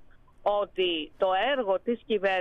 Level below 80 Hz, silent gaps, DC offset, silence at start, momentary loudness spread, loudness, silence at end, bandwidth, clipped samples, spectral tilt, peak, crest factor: -58 dBFS; none; under 0.1%; 0 s; 3 LU; -28 LUFS; 0 s; 6.2 kHz; under 0.1%; -5.5 dB/octave; -14 dBFS; 12 dB